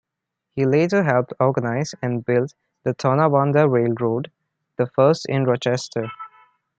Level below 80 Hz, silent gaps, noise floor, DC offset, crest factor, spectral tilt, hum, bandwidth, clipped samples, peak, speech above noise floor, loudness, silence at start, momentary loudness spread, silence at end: -64 dBFS; none; -82 dBFS; under 0.1%; 18 dB; -7 dB/octave; none; 8.6 kHz; under 0.1%; -2 dBFS; 63 dB; -20 LUFS; 0.55 s; 13 LU; 0.5 s